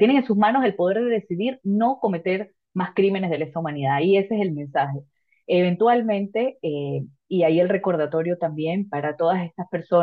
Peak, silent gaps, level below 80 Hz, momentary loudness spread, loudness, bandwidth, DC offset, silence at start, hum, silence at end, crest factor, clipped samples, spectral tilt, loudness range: -6 dBFS; none; -70 dBFS; 9 LU; -22 LUFS; 4.9 kHz; under 0.1%; 0 s; none; 0 s; 16 dB; under 0.1%; -10 dB/octave; 2 LU